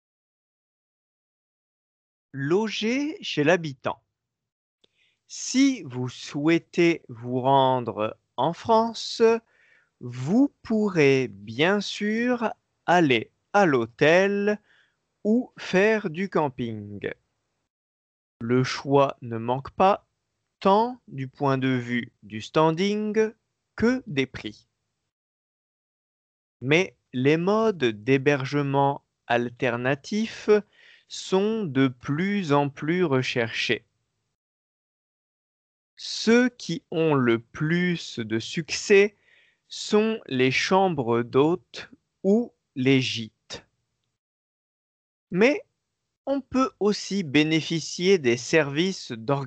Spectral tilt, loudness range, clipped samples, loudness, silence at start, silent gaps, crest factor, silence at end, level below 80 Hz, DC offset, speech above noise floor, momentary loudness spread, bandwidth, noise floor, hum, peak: -5.5 dB/octave; 5 LU; under 0.1%; -24 LUFS; 2.35 s; 4.52-4.78 s, 17.70-18.40 s, 25.12-26.60 s, 34.35-35.97 s, 44.19-45.27 s, 46.17-46.24 s; 20 dB; 0 s; -64 dBFS; under 0.1%; 57 dB; 12 LU; 8.8 kHz; -80 dBFS; none; -6 dBFS